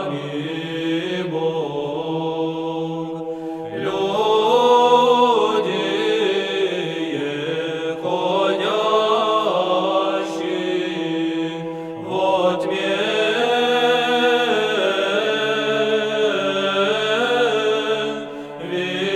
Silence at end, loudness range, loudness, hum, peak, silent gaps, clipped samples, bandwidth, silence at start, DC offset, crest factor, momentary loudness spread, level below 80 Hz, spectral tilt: 0 s; 5 LU; -20 LUFS; none; -2 dBFS; none; under 0.1%; 13 kHz; 0 s; under 0.1%; 18 dB; 10 LU; -64 dBFS; -4.5 dB/octave